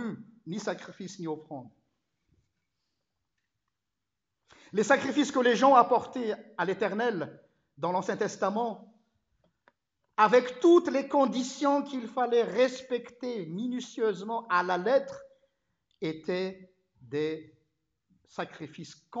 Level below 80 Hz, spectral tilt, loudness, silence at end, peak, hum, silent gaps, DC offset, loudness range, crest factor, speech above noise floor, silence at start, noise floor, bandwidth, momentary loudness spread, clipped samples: -80 dBFS; -5 dB/octave; -28 LUFS; 0 s; -8 dBFS; none; none; under 0.1%; 12 LU; 22 dB; 59 dB; 0 s; -87 dBFS; 8 kHz; 18 LU; under 0.1%